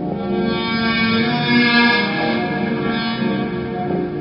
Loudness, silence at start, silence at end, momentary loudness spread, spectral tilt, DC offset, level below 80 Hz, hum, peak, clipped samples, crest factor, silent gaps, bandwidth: -18 LUFS; 0 s; 0 s; 9 LU; -8.5 dB/octave; under 0.1%; -46 dBFS; none; -2 dBFS; under 0.1%; 16 dB; none; 5.6 kHz